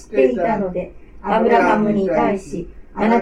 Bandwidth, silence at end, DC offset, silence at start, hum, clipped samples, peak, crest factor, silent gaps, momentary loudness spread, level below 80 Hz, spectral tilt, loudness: 10.5 kHz; 0 s; under 0.1%; 0 s; none; under 0.1%; -2 dBFS; 16 dB; none; 17 LU; -42 dBFS; -7 dB/octave; -18 LUFS